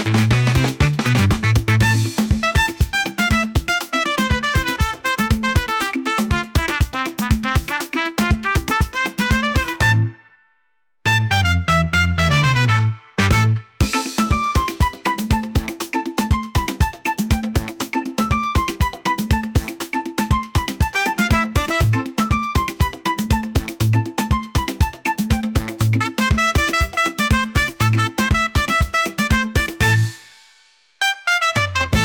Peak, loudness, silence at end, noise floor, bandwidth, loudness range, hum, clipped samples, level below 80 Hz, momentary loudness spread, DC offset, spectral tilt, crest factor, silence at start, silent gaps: -6 dBFS; -19 LUFS; 0 s; -69 dBFS; 19.5 kHz; 4 LU; none; under 0.1%; -28 dBFS; 6 LU; under 0.1%; -5 dB/octave; 14 dB; 0 s; none